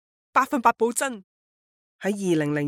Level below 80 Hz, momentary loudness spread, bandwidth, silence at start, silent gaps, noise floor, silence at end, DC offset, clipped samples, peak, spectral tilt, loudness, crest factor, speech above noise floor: -68 dBFS; 10 LU; 17 kHz; 0.35 s; 1.24-1.99 s; under -90 dBFS; 0 s; under 0.1%; under 0.1%; -4 dBFS; -5 dB/octave; -24 LUFS; 20 dB; over 67 dB